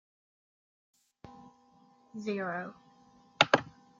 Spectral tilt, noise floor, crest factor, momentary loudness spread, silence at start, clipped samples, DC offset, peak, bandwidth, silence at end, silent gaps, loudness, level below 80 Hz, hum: -3.5 dB/octave; -63 dBFS; 32 dB; 25 LU; 1.25 s; under 0.1%; under 0.1%; -4 dBFS; 7.8 kHz; 0.3 s; none; -30 LUFS; -74 dBFS; none